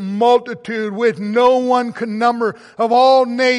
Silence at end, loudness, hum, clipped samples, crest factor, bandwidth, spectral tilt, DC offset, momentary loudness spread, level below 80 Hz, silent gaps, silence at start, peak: 0 s; -16 LUFS; none; under 0.1%; 12 dB; 11 kHz; -5 dB/octave; under 0.1%; 11 LU; -66 dBFS; none; 0 s; -2 dBFS